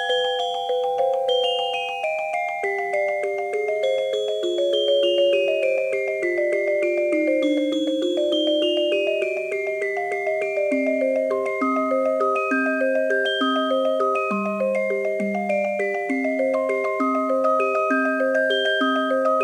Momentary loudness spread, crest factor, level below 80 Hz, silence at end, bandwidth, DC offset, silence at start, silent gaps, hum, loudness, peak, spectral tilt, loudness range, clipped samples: 5 LU; 12 dB; -74 dBFS; 0 s; 10.5 kHz; under 0.1%; 0 s; none; none; -22 LUFS; -10 dBFS; -4 dB/octave; 2 LU; under 0.1%